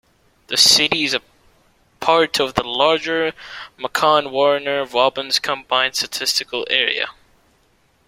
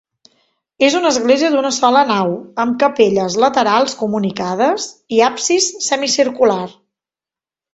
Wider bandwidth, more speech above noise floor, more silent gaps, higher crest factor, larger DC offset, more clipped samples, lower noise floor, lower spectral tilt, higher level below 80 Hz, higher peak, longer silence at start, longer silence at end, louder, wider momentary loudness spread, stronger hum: first, 16.5 kHz vs 8.4 kHz; second, 41 dB vs 75 dB; neither; about the same, 20 dB vs 16 dB; neither; neither; second, -59 dBFS vs -90 dBFS; second, -1.5 dB/octave vs -3 dB/octave; about the same, -56 dBFS vs -60 dBFS; about the same, 0 dBFS vs 0 dBFS; second, 0.5 s vs 0.8 s; about the same, 0.95 s vs 1.05 s; about the same, -17 LUFS vs -15 LUFS; first, 11 LU vs 7 LU; neither